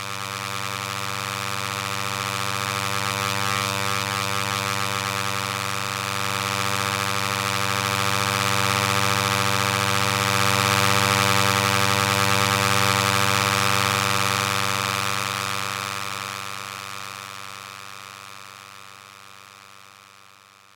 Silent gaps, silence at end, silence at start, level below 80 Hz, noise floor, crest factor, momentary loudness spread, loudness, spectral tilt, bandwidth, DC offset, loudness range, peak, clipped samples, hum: none; 0.8 s; 0 s; -66 dBFS; -51 dBFS; 22 dB; 15 LU; -22 LUFS; -2.5 dB/octave; 17 kHz; under 0.1%; 14 LU; -2 dBFS; under 0.1%; 60 Hz at -45 dBFS